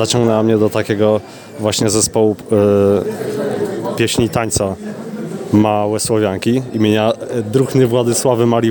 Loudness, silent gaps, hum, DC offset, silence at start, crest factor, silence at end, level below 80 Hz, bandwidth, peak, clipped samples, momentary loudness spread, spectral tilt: -15 LUFS; none; none; under 0.1%; 0 s; 14 dB; 0 s; -46 dBFS; 19.5 kHz; 0 dBFS; under 0.1%; 8 LU; -5 dB/octave